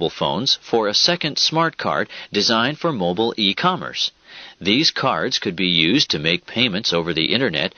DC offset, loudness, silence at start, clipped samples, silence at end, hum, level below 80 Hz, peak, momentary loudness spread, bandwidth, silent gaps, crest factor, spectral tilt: under 0.1%; -18 LUFS; 0 s; under 0.1%; 0.1 s; none; -56 dBFS; 0 dBFS; 7 LU; 6.8 kHz; none; 20 dB; -2 dB/octave